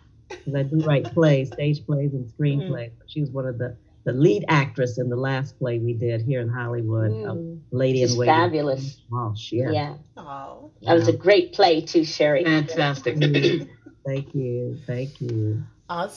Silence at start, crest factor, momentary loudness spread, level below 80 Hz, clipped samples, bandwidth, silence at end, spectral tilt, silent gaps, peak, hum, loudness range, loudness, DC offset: 0.3 s; 18 dB; 14 LU; -60 dBFS; under 0.1%; 7 kHz; 0 s; -6.5 dB/octave; none; -4 dBFS; none; 4 LU; -23 LUFS; under 0.1%